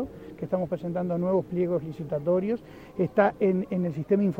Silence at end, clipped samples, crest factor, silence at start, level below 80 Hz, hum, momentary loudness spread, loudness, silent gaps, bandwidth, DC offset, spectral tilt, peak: 0 s; under 0.1%; 20 dB; 0 s; -58 dBFS; none; 9 LU; -27 LUFS; none; 5.8 kHz; under 0.1%; -10 dB/octave; -8 dBFS